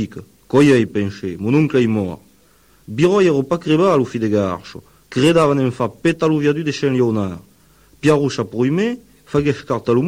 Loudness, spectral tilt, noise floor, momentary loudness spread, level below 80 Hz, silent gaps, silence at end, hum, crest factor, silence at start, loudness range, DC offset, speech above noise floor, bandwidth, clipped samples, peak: -17 LUFS; -7 dB/octave; -53 dBFS; 13 LU; -50 dBFS; none; 0 s; none; 14 dB; 0 s; 2 LU; under 0.1%; 37 dB; 16 kHz; under 0.1%; -2 dBFS